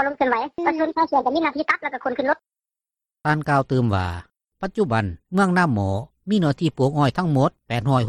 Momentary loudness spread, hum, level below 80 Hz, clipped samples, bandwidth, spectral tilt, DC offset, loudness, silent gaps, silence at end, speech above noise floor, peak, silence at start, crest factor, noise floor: 7 LU; none; -52 dBFS; under 0.1%; 12 kHz; -7.5 dB/octave; under 0.1%; -22 LUFS; none; 0 s; 69 dB; -6 dBFS; 0 s; 16 dB; -90 dBFS